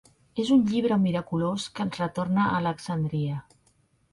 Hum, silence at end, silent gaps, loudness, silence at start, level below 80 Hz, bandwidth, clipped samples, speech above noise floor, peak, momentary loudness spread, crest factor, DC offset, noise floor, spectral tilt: none; 0.7 s; none; -26 LUFS; 0.35 s; -60 dBFS; 11.5 kHz; under 0.1%; 40 dB; -12 dBFS; 9 LU; 16 dB; under 0.1%; -66 dBFS; -7 dB/octave